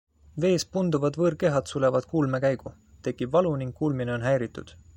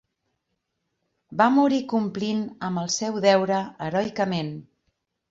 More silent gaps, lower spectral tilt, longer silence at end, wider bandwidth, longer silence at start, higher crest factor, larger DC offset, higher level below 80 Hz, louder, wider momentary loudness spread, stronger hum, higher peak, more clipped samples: neither; first, -6.5 dB/octave vs -5 dB/octave; second, 0.25 s vs 0.7 s; first, 16.5 kHz vs 7.8 kHz; second, 0.35 s vs 1.3 s; about the same, 16 dB vs 20 dB; neither; first, -56 dBFS vs -66 dBFS; about the same, -26 LUFS vs -24 LUFS; about the same, 11 LU vs 10 LU; neither; second, -10 dBFS vs -6 dBFS; neither